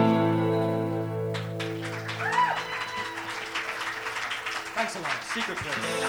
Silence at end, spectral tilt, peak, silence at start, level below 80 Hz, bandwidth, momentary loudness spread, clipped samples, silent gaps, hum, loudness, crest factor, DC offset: 0 s; -5 dB/octave; -12 dBFS; 0 s; -64 dBFS; over 20 kHz; 8 LU; under 0.1%; none; none; -29 LUFS; 16 dB; under 0.1%